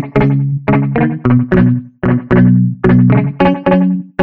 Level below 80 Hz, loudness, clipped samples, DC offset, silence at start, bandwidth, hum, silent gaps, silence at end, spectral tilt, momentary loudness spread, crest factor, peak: -34 dBFS; -12 LUFS; under 0.1%; under 0.1%; 0 s; 4.7 kHz; none; none; 0 s; -11 dB/octave; 6 LU; 10 dB; 0 dBFS